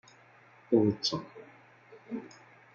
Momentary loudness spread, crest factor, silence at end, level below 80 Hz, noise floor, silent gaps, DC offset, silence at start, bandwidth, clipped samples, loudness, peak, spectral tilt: 24 LU; 22 dB; 0.45 s; -74 dBFS; -59 dBFS; none; under 0.1%; 0.7 s; 7.6 kHz; under 0.1%; -31 LUFS; -12 dBFS; -5.5 dB/octave